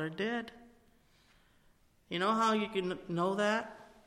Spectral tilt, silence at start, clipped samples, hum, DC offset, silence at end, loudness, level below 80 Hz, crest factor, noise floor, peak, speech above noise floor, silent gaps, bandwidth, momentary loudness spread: -5 dB/octave; 0 s; under 0.1%; none; under 0.1%; 0.2 s; -33 LUFS; -70 dBFS; 18 dB; -67 dBFS; -18 dBFS; 34 dB; none; 15 kHz; 11 LU